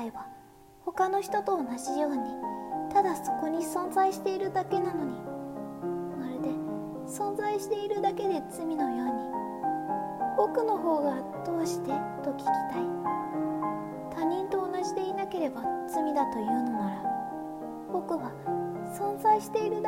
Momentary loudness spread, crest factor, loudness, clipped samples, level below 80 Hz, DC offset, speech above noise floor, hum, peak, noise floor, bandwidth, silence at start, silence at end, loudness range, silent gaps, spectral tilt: 9 LU; 18 dB; -31 LUFS; under 0.1%; -66 dBFS; under 0.1%; 24 dB; none; -12 dBFS; -54 dBFS; 16 kHz; 0 s; 0 s; 3 LU; none; -5.5 dB/octave